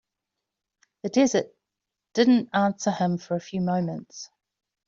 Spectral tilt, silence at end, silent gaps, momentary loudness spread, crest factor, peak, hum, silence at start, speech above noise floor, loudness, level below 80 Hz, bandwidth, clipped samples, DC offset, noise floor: -5.5 dB/octave; 0.6 s; none; 20 LU; 20 dB; -6 dBFS; none; 1.05 s; 62 dB; -24 LUFS; -68 dBFS; 7.6 kHz; under 0.1%; under 0.1%; -86 dBFS